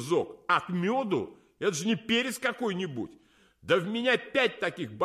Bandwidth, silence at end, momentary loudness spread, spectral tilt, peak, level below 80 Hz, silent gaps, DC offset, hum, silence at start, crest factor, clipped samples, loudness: 15.5 kHz; 0 s; 9 LU; -4.5 dB/octave; -12 dBFS; -68 dBFS; none; under 0.1%; none; 0 s; 18 dB; under 0.1%; -29 LUFS